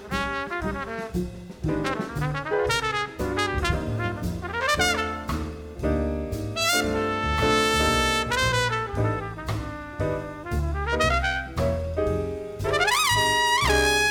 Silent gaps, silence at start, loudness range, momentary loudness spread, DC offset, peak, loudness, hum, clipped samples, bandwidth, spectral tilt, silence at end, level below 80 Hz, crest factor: none; 0 s; 4 LU; 11 LU; under 0.1%; -6 dBFS; -25 LUFS; none; under 0.1%; 19.5 kHz; -4 dB/octave; 0 s; -36 dBFS; 18 dB